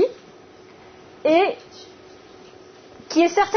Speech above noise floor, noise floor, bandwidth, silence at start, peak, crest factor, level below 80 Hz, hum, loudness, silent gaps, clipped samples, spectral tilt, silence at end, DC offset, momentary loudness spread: 28 dB; -46 dBFS; 6.6 kHz; 0 s; -6 dBFS; 18 dB; -62 dBFS; none; -20 LUFS; none; under 0.1%; -3.5 dB/octave; 0 s; under 0.1%; 25 LU